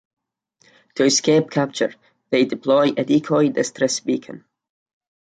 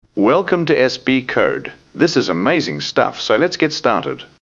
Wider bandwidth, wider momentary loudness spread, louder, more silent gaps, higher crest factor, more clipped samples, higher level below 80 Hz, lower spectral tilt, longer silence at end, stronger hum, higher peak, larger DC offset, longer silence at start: first, 9.4 kHz vs 7.6 kHz; first, 9 LU vs 4 LU; second, -19 LUFS vs -16 LUFS; neither; about the same, 16 dB vs 16 dB; neither; second, -66 dBFS vs -54 dBFS; about the same, -4 dB/octave vs -5 dB/octave; first, 0.85 s vs 0.15 s; neither; second, -4 dBFS vs 0 dBFS; neither; first, 0.95 s vs 0.15 s